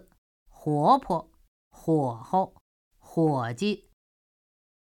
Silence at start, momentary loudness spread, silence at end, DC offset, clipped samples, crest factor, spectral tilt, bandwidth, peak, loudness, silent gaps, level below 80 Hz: 0.65 s; 13 LU; 1.1 s; under 0.1%; under 0.1%; 22 dB; -7.5 dB/octave; 16 kHz; -8 dBFS; -27 LUFS; 1.48-1.71 s, 2.61-2.91 s; -62 dBFS